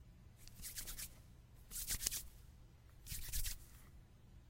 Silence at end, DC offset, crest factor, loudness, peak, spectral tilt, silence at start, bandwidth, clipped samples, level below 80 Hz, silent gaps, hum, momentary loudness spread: 0 s; under 0.1%; 36 dB; -45 LUFS; -12 dBFS; -1 dB/octave; 0 s; 16 kHz; under 0.1%; -54 dBFS; none; none; 24 LU